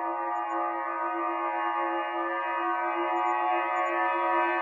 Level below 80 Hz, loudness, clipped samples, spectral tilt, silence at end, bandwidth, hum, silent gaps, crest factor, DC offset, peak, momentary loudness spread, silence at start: under -90 dBFS; -28 LUFS; under 0.1%; -3 dB/octave; 0 s; 7.4 kHz; none; none; 16 dB; under 0.1%; -12 dBFS; 5 LU; 0 s